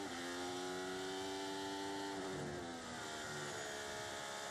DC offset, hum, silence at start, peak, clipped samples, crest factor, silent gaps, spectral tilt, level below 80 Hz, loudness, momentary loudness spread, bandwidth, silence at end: under 0.1%; none; 0 s; -34 dBFS; under 0.1%; 12 dB; none; -3 dB/octave; -74 dBFS; -44 LUFS; 2 LU; 15.5 kHz; 0 s